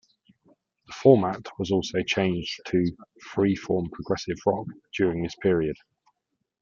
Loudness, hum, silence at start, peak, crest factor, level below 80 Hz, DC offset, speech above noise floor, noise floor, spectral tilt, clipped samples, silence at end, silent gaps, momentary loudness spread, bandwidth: -26 LUFS; none; 0.9 s; -4 dBFS; 22 dB; -56 dBFS; under 0.1%; 55 dB; -80 dBFS; -6.5 dB/octave; under 0.1%; 0.9 s; none; 12 LU; 7.4 kHz